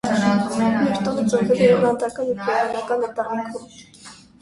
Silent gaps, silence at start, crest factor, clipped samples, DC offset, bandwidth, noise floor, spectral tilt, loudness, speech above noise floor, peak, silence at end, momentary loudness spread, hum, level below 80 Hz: none; 0.05 s; 16 dB; under 0.1%; under 0.1%; 11.5 kHz; -45 dBFS; -6 dB/octave; -20 LUFS; 24 dB; -4 dBFS; 0.25 s; 10 LU; none; -56 dBFS